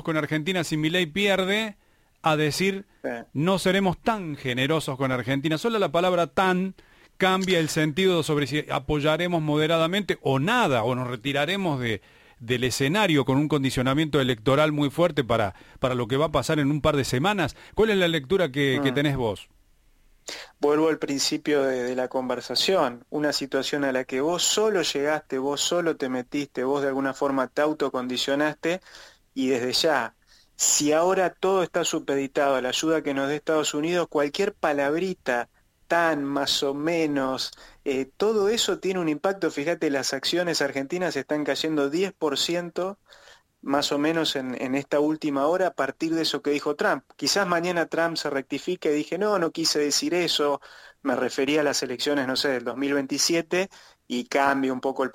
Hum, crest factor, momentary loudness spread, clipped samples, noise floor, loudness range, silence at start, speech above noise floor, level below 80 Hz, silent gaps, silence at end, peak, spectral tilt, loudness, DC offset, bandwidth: none; 18 dB; 7 LU; under 0.1%; -59 dBFS; 3 LU; 0.05 s; 35 dB; -54 dBFS; none; 0.05 s; -6 dBFS; -4 dB/octave; -24 LUFS; under 0.1%; 16.5 kHz